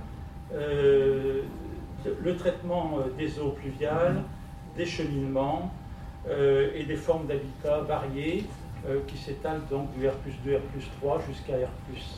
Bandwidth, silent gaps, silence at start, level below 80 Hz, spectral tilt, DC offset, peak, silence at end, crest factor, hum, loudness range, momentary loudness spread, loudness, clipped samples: 13.5 kHz; none; 0 s; -44 dBFS; -7 dB/octave; under 0.1%; -12 dBFS; 0 s; 16 dB; none; 3 LU; 14 LU; -30 LUFS; under 0.1%